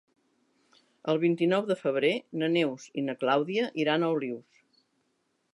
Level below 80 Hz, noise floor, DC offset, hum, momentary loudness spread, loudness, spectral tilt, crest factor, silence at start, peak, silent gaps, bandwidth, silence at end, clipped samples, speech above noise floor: -84 dBFS; -75 dBFS; under 0.1%; none; 8 LU; -28 LUFS; -6.5 dB/octave; 18 dB; 1.05 s; -12 dBFS; none; 11.5 kHz; 1.15 s; under 0.1%; 48 dB